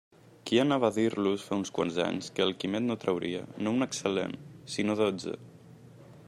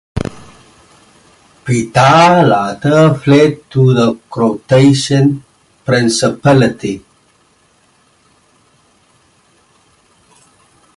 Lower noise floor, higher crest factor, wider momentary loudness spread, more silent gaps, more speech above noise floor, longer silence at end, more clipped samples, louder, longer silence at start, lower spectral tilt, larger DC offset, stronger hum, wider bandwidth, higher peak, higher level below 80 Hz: about the same, -52 dBFS vs -53 dBFS; first, 20 dB vs 14 dB; second, 11 LU vs 15 LU; neither; second, 23 dB vs 43 dB; second, 0 s vs 4 s; neither; second, -30 LUFS vs -11 LUFS; first, 0.45 s vs 0.15 s; about the same, -5 dB/octave vs -6 dB/octave; neither; neither; first, 13 kHz vs 11.5 kHz; second, -10 dBFS vs 0 dBFS; second, -70 dBFS vs -44 dBFS